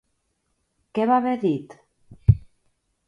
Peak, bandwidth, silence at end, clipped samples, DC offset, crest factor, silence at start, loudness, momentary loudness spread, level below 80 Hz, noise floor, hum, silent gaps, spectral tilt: -2 dBFS; 5.2 kHz; 0.7 s; under 0.1%; under 0.1%; 22 dB; 0.95 s; -23 LUFS; 8 LU; -38 dBFS; -73 dBFS; none; none; -10 dB/octave